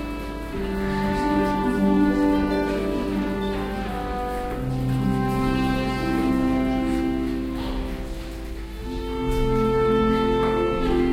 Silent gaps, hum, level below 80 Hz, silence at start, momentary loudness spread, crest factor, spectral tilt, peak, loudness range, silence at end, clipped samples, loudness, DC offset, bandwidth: none; none; -32 dBFS; 0 s; 11 LU; 14 dB; -7 dB/octave; -8 dBFS; 3 LU; 0 s; under 0.1%; -24 LUFS; under 0.1%; 16 kHz